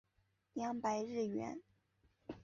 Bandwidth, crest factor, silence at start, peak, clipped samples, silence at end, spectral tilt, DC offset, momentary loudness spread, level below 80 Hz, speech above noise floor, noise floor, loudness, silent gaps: 7.2 kHz; 18 dB; 0.55 s; -26 dBFS; under 0.1%; 0 s; -5.5 dB/octave; under 0.1%; 15 LU; -76 dBFS; 39 dB; -80 dBFS; -41 LUFS; none